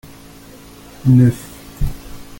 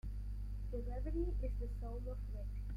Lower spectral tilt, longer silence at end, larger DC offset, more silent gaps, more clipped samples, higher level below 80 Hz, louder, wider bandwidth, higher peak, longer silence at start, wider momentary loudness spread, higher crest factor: second, -8 dB/octave vs -9.5 dB/octave; first, 0.15 s vs 0 s; neither; neither; neither; first, -30 dBFS vs -42 dBFS; first, -16 LUFS vs -44 LUFS; first, 17 kHz vs 5 kHz; first, -2 dBFS vs -28 dBFS; first, 1.05 s vs 0.05 s; first, 23 LU vs 6 LU; about the same, 16 dB vs 14 dB